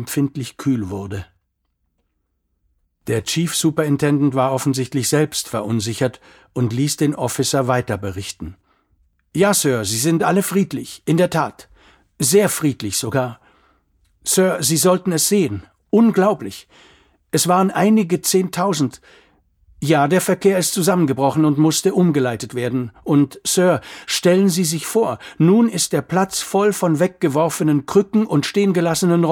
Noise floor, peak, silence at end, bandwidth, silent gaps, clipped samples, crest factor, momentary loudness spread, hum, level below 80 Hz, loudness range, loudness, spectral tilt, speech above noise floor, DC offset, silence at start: -71 dBFS; -2 dBFS; 0 s; 18.5 kHz; none; under 0.1%; 16 dB; 9 LU; none; -54 dBFS; 4 LU; -18 LUFS; -5 dB/octave; 53 dB; under 0.1%; 0 s